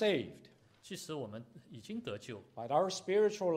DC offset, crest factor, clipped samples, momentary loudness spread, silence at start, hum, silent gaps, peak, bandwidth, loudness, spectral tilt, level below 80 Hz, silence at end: under 0.1%; 18 dB; under 0.1%; 17 LU; 0 s; none; none; -18 dBFS; 15 kHz; -36 LUFS; -4.5 dB/octave; -78 dBFS; 0 s